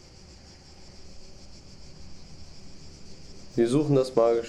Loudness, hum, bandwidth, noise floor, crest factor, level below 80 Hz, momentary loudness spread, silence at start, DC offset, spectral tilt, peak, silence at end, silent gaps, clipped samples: -24 LUFS; none; 11.5 kHz; -49 dBFS; 20 dB; -54 dBFS; 26 LU; 0.8 s; under 0.1%; -7 dB/octave; -8 dBFS; 0 s; none; under 0.1%